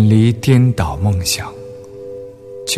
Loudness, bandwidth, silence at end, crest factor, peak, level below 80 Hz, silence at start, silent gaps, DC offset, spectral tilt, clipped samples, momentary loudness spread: -15 LUFS; 14 kHz; 0 s; 14 dB; -2 dBFS; -36 dBFS; 0 s; none; under 0.1%; -5.5 dB/octave; under 0.1%; 21 LU